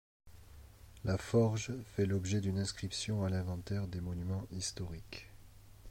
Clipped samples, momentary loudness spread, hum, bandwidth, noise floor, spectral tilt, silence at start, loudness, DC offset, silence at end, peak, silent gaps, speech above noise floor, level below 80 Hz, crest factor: under 0.1%; 16 LU; none; 16 kHz; -56 dBFS; -5.5 dB/octave; 0.25 s; -37 LUFS; under 0.1%; 0 s; -18 dBFS; none; 20 dB; -56 dBFS; 18 dB